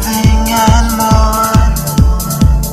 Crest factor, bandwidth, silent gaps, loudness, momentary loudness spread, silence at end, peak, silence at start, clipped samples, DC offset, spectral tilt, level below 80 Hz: 10 dB; 16 kHz; none; -11 LUFS; 2 LU; 0 s; 0 dBFS; 0 s; 0.5%; under 0.1%; -5 dB/octave; -12 dBFS